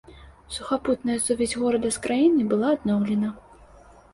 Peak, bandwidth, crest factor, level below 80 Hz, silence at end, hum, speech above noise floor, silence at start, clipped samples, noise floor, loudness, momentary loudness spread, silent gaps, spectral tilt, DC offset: -10 dBFS; 11.5 kHz; 14 dB; -52 dBFS; 0.75 s; none; 27 dB; 0.1 s; under 0.1%; -50 dBFS; -24 LUFS; 8 LU; none; -5 dB/octave; under 0.1%